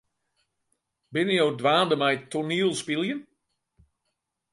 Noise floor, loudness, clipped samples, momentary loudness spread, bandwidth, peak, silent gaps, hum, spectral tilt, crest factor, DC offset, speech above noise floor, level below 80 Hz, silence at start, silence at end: -80 dBFS; -25 LUFS; under 0.1%; 9 LU; 11.5 kHz; -10 dBFS; none; none; -4.5 dB/octave; 18 dB; under 0.1%; 56 dB; -72 dBFS; 1.1 s; 1.3 s